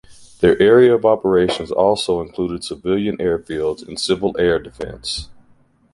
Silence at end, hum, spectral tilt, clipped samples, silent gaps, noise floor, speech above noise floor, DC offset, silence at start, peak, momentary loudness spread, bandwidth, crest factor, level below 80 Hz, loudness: 0.6 s; none; -5.5 dB/octave; under 0.1%; none; -54 dBFS; 37 dB; under 0.1%; 0.1 s; -2 dBFS; 14 LU; 11.5 kHz; 16 dB; -44 dBFS; -17 LUFS